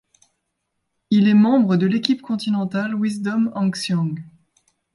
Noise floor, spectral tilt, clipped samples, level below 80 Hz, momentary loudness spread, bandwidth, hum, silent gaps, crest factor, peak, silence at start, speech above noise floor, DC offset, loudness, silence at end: -75 dBFS; -6.5 dB/octave; under 0.1%; -66 dBFS; 9 LU; 11.5 kHz; none; none; 18 dB; -4 dBFS; 1.1 s; 57 dB; under 0.1%; -19 LUFS; 0.65 s